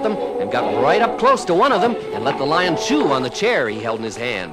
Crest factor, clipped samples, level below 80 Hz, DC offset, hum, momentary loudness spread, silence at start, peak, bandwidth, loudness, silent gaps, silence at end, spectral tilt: 14 dB; under 0.1%; -52 dBFS; under 0.1%; none; 8 LU; 0 s; -4 dBFS; 14 kHz; -18 LUFS; none; 0 s; -4.5 dB/octave